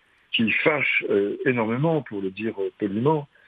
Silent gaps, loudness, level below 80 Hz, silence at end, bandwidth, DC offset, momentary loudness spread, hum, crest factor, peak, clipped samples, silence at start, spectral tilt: none; -23 LUFS; -70 dBFS; 0.2 s; 4.9 kHz; under 0.1%; 9 LU; none; 18 dB; -6 dBFS; under 0.1%; 0.3 s; -8.5 dB/octave